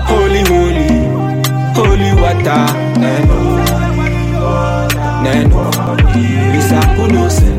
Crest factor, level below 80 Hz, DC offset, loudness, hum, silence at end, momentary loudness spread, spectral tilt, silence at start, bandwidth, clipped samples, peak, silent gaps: 10 dB; -16 dBFS; under 0.1%; -12 LUFS; none; 0 s; 4 LU; -6 dB/octave; 0 s; 16.5 kHz; under 0.1%; 0 dBFS; none